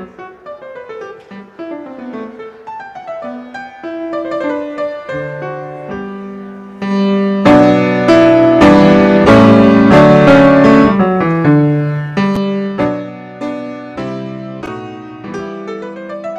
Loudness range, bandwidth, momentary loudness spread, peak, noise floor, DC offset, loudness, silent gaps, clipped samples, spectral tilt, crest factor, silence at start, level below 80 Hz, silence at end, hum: 19 LU; 9.2 kHz; 23 LU; 0 dBFS; -33 dBFS; under 0.1%; -10 LUFS; none; under 0.1%; -7.5 dB/octave; 12 dB; 0 s; -38 dBFS; 0 s; none